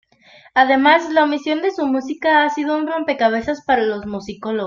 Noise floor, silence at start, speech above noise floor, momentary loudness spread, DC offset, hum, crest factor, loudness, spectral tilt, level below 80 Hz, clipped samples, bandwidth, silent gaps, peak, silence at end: -49 dBFS; 0.55 s; 31 dB; 9 LU; under 0.1%; none; 16 dB; -17 LUFS; -4.5 dB/octave; -56 dBFS; under 0.1%; 7.4 kHz; none; -2 dBFS; 0 s